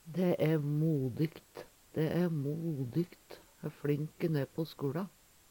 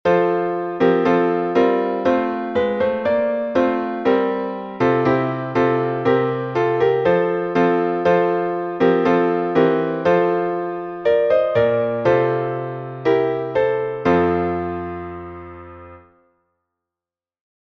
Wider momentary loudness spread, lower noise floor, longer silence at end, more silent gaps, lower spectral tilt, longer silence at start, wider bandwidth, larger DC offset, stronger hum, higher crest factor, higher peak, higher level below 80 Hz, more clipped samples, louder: first, 15 LU vs 8 LU; second, -56 dBFS vs under -90 dBFS; second, 0.4 s vs 1.8 s; neither; about the same, -8.5 dB/octave vs -8 dB/octave; about the same, 0.05 s vs 0.05 s; first, 18 kHz vs 6.2 kHz; neither; neither; about the same, 16 dB vs 16 dB; second, -18 dBFS vs -4 dBFS; second, -70 dBFS vs -54 dBFS; neither; second, -35 LUFS vs -19 LUFS